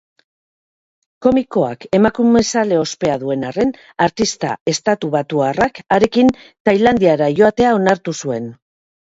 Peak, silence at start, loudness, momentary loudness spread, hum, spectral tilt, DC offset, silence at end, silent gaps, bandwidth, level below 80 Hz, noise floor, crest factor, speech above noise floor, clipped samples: 0 dBFS; 1.2 s; -16 LUFS; 8 LU; none; -5 dB/octave; under 0.1%; 0.5 s; 4.61-4.66 s, 6.60-6.65 s; 8 kHz; -48 dBFS; under -90 dBFS; 16 dB; over 75 dB; under 0.1%